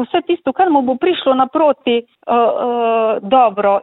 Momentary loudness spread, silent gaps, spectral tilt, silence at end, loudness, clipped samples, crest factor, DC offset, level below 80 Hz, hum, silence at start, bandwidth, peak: 5 LU; none; -9.5 dB/octave; 0 s; -15 LUFS; under 0.1%; 14 dB; under 0.1%; -60 dBFS; none; 0 s; 4.1 kHz; -2 dBFS